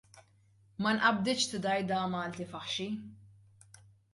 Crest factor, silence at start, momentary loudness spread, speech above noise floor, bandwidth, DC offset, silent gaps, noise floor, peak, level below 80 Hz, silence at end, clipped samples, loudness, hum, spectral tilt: 22 dB; 0.15 s; 14 LU; 33 dB; 11.5 kHz; under 0.1%; none; -65 dBFS; -12 dBFS; -70 dBFS; 0.85 s; under 0.1%; -32 LUFS; none; -3.5 dB/octave